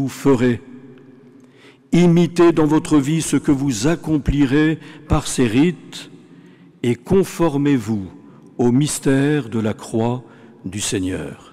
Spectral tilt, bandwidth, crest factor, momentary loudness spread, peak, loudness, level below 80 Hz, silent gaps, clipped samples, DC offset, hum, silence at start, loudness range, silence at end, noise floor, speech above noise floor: -6 dB/octave; 15.5 kHz; 10 dB; 13 LU; -8 dBFS; -18 LUFS; -38 dBFS; none; under 0.1%; under 0.1%; none; 0 s; 4 LU; 0.15 s; -47 dBFS; 30 dB